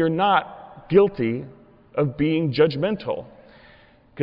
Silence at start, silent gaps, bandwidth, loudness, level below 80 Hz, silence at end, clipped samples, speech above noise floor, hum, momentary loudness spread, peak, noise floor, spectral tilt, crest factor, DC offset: 0 s; none; 5.6 kHz; -22 LUFS; -56 dBFS; 0 s; under 0.1%; 31 dB; none; 14 LU; -6 dBFS; -52 dBFS; -10 dB/octave; 16 dB; under 0.1%